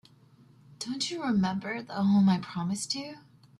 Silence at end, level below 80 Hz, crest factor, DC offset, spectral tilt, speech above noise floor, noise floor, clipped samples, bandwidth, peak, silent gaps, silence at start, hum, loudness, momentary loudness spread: 0.4 s; -68 dBFS; 14 dB; under 0.1%; -5 dB/octave; 30 dB; -58 dBFS; under 0.1%; 12 kHz; -16 dBFS; none; 0.8 s; none; -29 LUFS; 12 LU